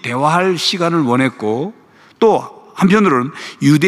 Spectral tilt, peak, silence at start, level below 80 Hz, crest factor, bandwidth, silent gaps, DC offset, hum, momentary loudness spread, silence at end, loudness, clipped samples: -5.5 dB/octave; -2 dBFS; 0.05 s; -60 dBFS; 14 dB; 14 kHz; none; under 0.1%; none; 10 LU; 0 s; -15 LUFS; under 0.1%